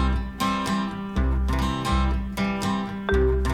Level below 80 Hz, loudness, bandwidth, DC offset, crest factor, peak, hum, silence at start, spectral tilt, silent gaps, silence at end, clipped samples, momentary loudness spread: -28 dBFS; -25 LUFS; 14.5 kHz; under 0.1%; 14 dB; -10 dBFS; none; 0 s; -6 dB/octave; none; 0 s; under 0.1%; 4 LU